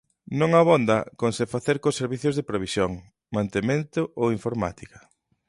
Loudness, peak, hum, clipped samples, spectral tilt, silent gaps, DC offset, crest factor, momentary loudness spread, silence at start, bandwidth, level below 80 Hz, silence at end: -24 LUFS; -6 dBFS; none; under 0.1%; -6 dB/octave; none; under 0.1%; 18 dB; 10 LU; 0.3 s; 11.5 kHz; -54 dBFS; 0.5 s